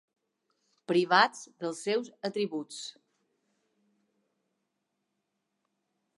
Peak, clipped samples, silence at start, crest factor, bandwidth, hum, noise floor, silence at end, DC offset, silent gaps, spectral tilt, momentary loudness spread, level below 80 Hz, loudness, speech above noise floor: -8 dBFS; under 0.1%; 0.9 s; 26 dB; 11.5 kHz; none; -82 dBFS; 3.25 s; under 0.1%; none; -4 dB/octave; 17 LU; under -90 dBFS; -29 LUFS; 53 dB